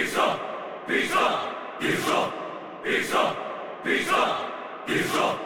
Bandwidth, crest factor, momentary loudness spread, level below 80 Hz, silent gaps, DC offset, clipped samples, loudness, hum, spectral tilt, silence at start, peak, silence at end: over 20 kHz; 16 dB; 11 LU; -68 dBFS; none; under 0.1%; under 0.1%; -26 LUFS; none; -3.5 dB/octave; 0 s; -10 dBFS; 0 s